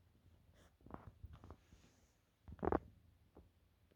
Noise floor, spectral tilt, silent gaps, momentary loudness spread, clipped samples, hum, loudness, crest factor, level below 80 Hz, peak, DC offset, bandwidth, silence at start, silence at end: -75 dBFS; -8.5 dB/octave; none; 27 LU; under 0.1%; none; -46 LUFS; 30 dB; -62 dBFS; -22 dBFS; under 0.1%; 16 kHz; 0.25 s; 0.55 s